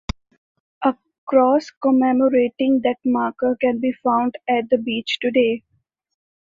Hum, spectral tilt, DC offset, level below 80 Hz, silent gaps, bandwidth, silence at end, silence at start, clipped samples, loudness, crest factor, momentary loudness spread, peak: none; -6 dB/octave; under 0.1%; -48 dBFS; 1.18-1.27 s, 1.77-1.81 s; 7.4 kHz; 0.95 s; 0.8 s; under 0.1%; -19 LUFS; 16 dB; 7 LU; -4 dBFS